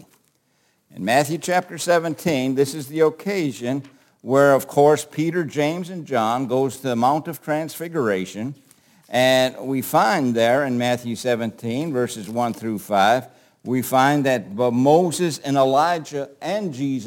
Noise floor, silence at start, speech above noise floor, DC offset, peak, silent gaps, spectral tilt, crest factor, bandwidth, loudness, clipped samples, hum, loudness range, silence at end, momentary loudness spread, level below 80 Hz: -65 dBFS; 0.95 s; 45 dB; under 0.1%; -2 dBFS; none; -5 dB/octave; 18 dB; 17 kHz; -21 LUFS; under 0.1%; none; 3 LU; 0 s; 10 LU; -68 dBFS